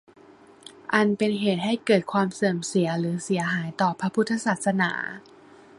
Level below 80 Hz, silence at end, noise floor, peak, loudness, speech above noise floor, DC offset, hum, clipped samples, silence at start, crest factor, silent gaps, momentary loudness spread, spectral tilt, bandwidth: -68 dBFS; 0.6 s; -51 dBFS; -4 dBFS; -25 LUFS; 27 dB; under 0.1%; none; under 0.1%; 0.65 s; 20 dB; none; 5 LU; -5.5 dB/octave; 11.5 kHz